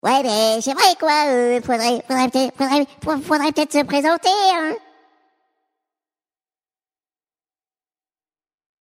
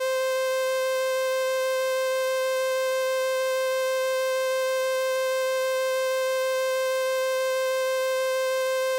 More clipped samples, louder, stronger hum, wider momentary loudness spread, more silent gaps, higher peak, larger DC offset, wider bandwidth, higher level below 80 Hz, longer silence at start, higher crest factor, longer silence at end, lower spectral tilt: neither; first, -18 LUFS vs -25 LUFS; second, none vs 50 Hz at -75 dBFS; first, 5 LU vs 0 LU; neither; first, 0 dBFS vs -18 dBFS; neither; about the same, 16 kHz vs 17 kHz; first, -60 dBFS vs -78 dBFS; about the same, 0.05 s vs 0 s; first, 20 dB vs 8 dB; first, 4.05 s vs 0 s; first, -2.5 dB/octave vs 2 dB/octave